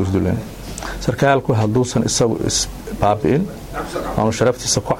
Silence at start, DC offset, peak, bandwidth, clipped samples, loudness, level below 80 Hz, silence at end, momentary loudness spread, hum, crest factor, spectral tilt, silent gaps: 0 s; under 0.1%; 0 dBFS; 16.5 kHz; under 0.1%; -18 LUFS; -36 dBFS; 0 s; 10 LU; none; 18 dB; -4.5 dB/octave; none